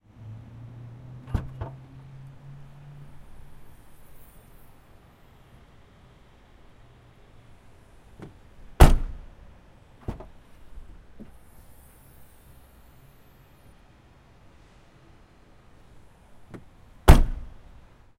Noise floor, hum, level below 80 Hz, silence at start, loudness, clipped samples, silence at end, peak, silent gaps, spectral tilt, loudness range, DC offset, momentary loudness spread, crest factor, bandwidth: -54 dBFS; none; -30 dBFS; 1.35 s; -24 LUFS; under 0.1%; 0.75 s; 0 dBFS; none; -6 dB/octave; 25 LU; under 0.1%; 31 LU; 28 dB; 16.5 kHz